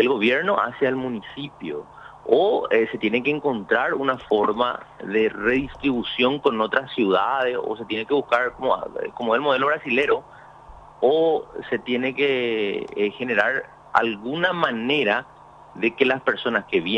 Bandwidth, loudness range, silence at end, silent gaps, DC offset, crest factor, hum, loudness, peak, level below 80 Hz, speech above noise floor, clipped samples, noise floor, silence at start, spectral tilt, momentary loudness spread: 7.2 kHz; 1 LU; 0 s; none; under 0.1%; 20 dB; none; -22 LUFS; -2 dBFS; -56 dBFS; 23 dB; under 0.1%; -45 dBFS; 0 s; -6.5 dB/octave; 9 LU